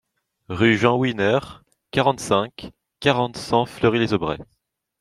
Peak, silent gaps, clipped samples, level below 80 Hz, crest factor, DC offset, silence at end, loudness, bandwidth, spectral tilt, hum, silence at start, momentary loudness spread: -2 dBFS; none; under 0.1%; -52 dBFS; 20 dB; under 0.1%; 0.55 s; -21 LUFS; 13 kHz; -5.5 dB/octave; none; 0.5 s; 15 LU